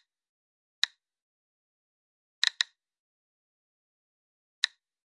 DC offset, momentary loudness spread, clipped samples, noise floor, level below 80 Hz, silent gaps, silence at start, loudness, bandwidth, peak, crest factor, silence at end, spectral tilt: under 0.1%; 5 LU; under 0.1%; under -90 dBFS; under -90 dBFS; 1.22-2.42 s, 2.99-4.62 s; 0.85 s; -30 LUFS; 11 kHz; -6 dBFS; 32 dB; 0.55 s; 9.5 dB/octave